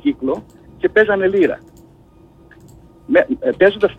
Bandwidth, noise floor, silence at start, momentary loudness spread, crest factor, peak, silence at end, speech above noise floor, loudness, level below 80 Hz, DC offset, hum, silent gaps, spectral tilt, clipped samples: 8 kHz; -47 dBFS; 0.05 s; 9 LU; 14 dB; -2 dBFS; 0.05 s; 32 dB; -16 LUFS; -48 dBFS; under 0.1%; none; none; -7 dB/octave; under 0.1%